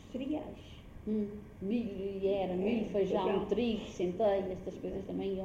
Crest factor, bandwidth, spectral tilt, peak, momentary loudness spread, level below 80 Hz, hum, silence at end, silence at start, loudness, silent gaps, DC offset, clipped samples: 16 dB; 7.8 kHz; -7.5 dB/octave; -20 dBFS; 10 LU; -56 dBFS; none; 0 s; 0 s; -35 LUFS; none; under 0.1%; under 0.1%